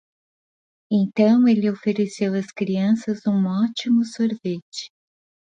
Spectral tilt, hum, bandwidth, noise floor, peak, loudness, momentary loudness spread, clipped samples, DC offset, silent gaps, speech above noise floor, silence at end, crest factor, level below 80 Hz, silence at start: -7 dB/octave; none; 9.4 kHz; under -90 dBFS; -6 dBFS; -21 LUFS; 12 LU; under 0.1%; under 0.1%; 4.62-4.72 s; over 70 dB; 0.7 s; 16 dB; -70 dBFS; 0.9 s